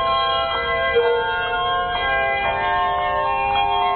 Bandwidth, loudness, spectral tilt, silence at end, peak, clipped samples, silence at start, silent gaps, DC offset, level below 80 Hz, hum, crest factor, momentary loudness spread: 4.5 kHz; -20 LUFS; -7 dB/octave; 0 s; -8 dBFS; under 0.1%; 0 s; none; under 0.1%; -40 dBFS; none; 12 dB; 2 LU